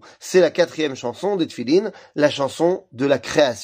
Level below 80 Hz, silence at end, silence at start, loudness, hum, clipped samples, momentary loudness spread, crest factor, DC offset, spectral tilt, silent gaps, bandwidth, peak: -64 dBFS; 0 s; 0.2 s; -20 LUFS; none; under 0.1%; 7 LU; 16 dB; under 0.1%; -4.5 dB/octave; none; 15.5 kHz; -4 dBFS